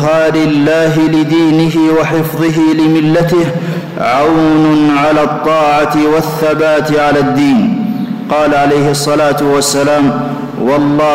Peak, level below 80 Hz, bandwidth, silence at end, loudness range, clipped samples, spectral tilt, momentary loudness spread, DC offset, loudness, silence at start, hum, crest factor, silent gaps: -4 dBFS; -40 dBFS; 16.5 kHz; 0 s; 1 LU; under 0.1%; -5.5 dB/octave; 5 LU; under 0.1%; -10 LUFS; 0 s; none; 6 dB; none